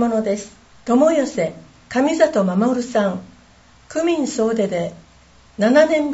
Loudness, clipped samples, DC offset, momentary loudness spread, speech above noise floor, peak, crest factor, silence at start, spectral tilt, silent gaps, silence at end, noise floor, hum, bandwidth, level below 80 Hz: -19 LUFS; under 0.1%; under 0.1%; 14 LU; 32 dB; -2 dBFS; 18 dB; 0 s; -5.5 dB/octave; none; 0 s; -50 dBFS; none; 8 kHz; -56 dBFS